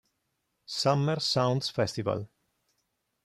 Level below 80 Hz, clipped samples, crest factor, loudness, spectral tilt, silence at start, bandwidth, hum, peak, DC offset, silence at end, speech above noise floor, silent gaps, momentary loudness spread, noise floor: -68 dBFS; under 0.1%; 20 dB; -29 LUFS; -5 dB/octave; 0.7 s; 13.5 kHz; none; -12 dBFS; under 0.1%; 1 s; 51 dB; none; 10 LU; -79 dBFS